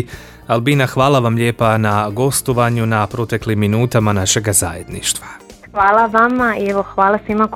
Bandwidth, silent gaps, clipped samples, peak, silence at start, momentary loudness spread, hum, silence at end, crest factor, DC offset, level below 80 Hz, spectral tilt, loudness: 16.5 kHz; none; under 0.1%; 0 dBFS; 0 s; 7 LU; none; 0 s; 16 dB; under 0.1%; -42 dBFS; -4.5 dB/octave; -15 LUFS